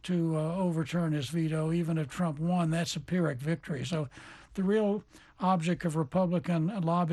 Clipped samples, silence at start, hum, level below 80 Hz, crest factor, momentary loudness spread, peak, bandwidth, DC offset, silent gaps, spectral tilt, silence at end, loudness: under 0.1%; 0.05 s; none; -60 dBFS; 16 dB; 5 LU; -14 dBFS; 12.5 kHz; under 0.1%; none; -7 dB/octave; 0 s; -31 LUFS